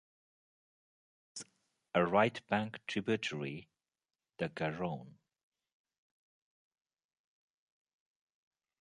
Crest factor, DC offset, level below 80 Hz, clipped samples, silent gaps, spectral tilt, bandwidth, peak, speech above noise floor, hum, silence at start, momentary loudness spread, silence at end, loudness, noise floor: 26 dB; under 0.1%; -74 dBFS; under 0.1%; none; -5.5 dB/octave; 11 kHz; -14 dBFS; over 55 dB; none; 1.35 s; 18 LU; 3.7 s; -35 LUFS; under -90 dBFS